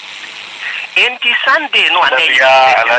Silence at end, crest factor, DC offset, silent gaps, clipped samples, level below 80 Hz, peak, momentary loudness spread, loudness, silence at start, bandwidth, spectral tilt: 0 s; 12 dB; under 0.1%; none; under 0.1%; -66 dBFS; 0 dBFS; 17 LU; -9 LUFS; 0 s; 9.4 kHz; -0.5 dB/octave